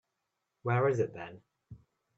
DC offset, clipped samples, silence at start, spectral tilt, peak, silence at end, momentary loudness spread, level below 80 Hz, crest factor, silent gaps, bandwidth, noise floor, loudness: under 0.1%; under 0.1%; 0.65 s; -8 dB/octave; -16 dBFS; 0.4 s; 17 LU; -70 dBFS; 20 dB; none; 7.8 kHz; -84 dBFS; -32 LUFS